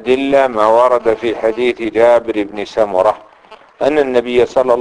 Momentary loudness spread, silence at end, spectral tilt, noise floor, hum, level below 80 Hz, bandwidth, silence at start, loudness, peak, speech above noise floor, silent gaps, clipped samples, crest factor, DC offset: 8 LU; 0 s; -5.5 dB/octave; -42 dBFS; none; -48 dBFS; 10.5 kHz; 0 s; -13 LUFS; 0 dBFS; 29 dB; none; under 0.1%; 12 dB; under 0.1%